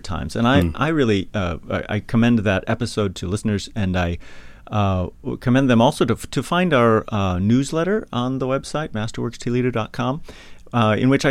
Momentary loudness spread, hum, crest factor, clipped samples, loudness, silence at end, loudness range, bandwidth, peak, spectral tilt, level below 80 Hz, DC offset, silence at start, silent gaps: 10 LU; none; 18 dB; under 0.1%; -20 LUFS; 0 s; 4 LU; 14.5 kHz; -2 dBFS; -6.5 dB/octave; -40 dBFS; under 0.1%; 0 s; none